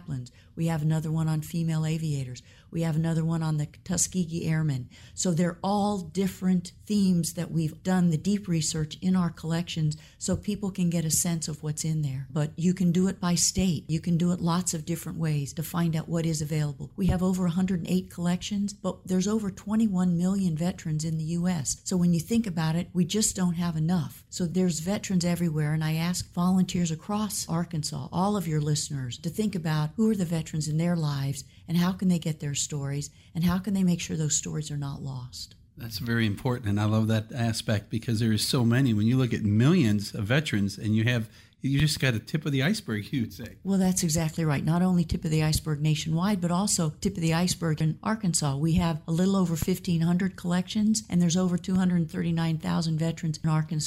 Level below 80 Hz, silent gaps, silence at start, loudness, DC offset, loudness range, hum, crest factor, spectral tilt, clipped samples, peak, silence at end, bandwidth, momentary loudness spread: -50 dBFS; none; 0 s; -27 LUFS; under 0.1%; 3 LU; none; 16 dB; -5.5 dB/octave; under 0.1%; -10 dBFS; 0 s; 16 kHz; 7 LU